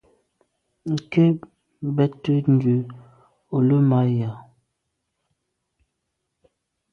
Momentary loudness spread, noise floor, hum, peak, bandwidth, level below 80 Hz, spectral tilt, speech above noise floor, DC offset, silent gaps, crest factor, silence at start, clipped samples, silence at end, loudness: 14 LU; -78 dBFS; none; -6 dBFS; 6.8 kHz; -64 dBFS; -9.5 dB/octave; 58 dB; under 0.1%; none; 18 dB; 0.85 s; under 0.1%; 2.5 s; -21 LUFS